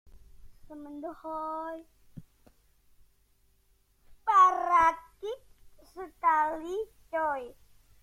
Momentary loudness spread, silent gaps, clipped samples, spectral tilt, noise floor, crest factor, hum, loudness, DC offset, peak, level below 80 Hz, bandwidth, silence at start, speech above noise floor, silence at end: 24 LU; none; under 0.1%; -4 dB/octave; -67 dBFS; 20 dB; 50 Hz at -70 dBFS; -28 LUFS; under 0.1%; -12 dBFS; -60 dBFS; 15.5 kHz; 0.15 s; 39 dB; 0.5 s